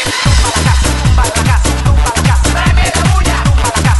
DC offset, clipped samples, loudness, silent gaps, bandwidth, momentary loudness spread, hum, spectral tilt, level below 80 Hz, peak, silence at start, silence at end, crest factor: under 0.1%; under 0.1%; -11 LUFS; none; 12 kHz; 1 LU; none; -4 dB/octave; -12 dBFS; 0 dBFS; 0 s; 0 s; 10 dB